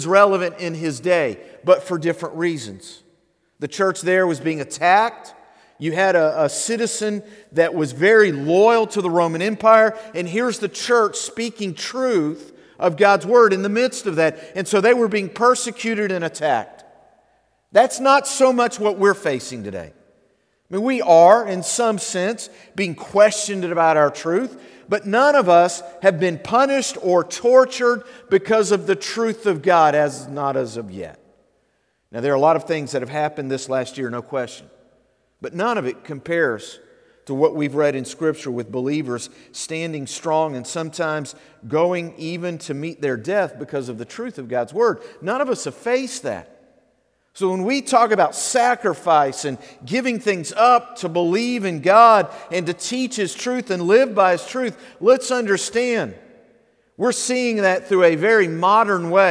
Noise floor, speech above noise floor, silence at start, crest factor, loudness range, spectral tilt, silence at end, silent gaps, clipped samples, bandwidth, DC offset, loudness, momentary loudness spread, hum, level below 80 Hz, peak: -66 dBFS; 48 dB; 0 s; 18 dB; 7 LU; -4 dB/octave; 0 s; none; under 0.1%; 11 kHz; under 0.1%; -19 LUFS; 14 LU; none; -68 dBFS; 0 dBFS